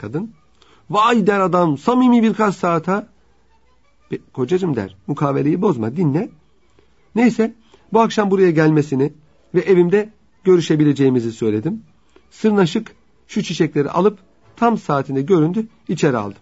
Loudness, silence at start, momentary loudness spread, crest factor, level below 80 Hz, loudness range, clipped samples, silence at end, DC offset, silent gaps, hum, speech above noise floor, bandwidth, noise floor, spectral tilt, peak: -17 LUFS; 0 s; 11 LU; 16 dB; -58 dBFS; 5 LU; under 0.1%; 0.1 s; 0.2%; none; none; 42 dB; 8 kHz; -58 dBFS; -7 dB/octave; -2 dBFS